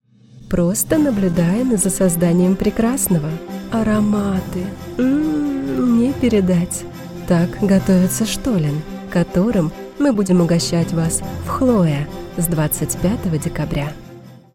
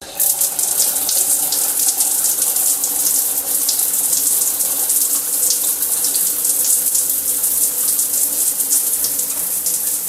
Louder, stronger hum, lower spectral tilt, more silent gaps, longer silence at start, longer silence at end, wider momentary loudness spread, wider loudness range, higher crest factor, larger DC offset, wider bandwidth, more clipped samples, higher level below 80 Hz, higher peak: second, -18 LUFS vs -14 LUFS; neither; first, -6 dB/octave vs 1.5 dB/octave; neither; first, 0.35 s vs 0 s; first, 0.2 s vs 0 s; first, 9 LU vs 2 LU; about the same, 2 LU vs 0 LU; about the same, 16 dB vs 18 dB; neither; about the same, 17 kHz vs 16.5 kHz; neither; first, -36 dBFS vs -58 dBFS; about the same, -2 dBFS vs 0 dBFS